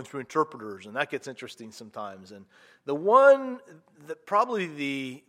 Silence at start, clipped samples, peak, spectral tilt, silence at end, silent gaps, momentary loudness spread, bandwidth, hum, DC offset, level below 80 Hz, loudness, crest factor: 0 s; under 0.1%; -6 dBFS; -5 dB/octave; 0.1 s; none; 23 LU; 10.5 kHz; none; under 0.1%; -84 dBFS; -25 LUFS; 22 dB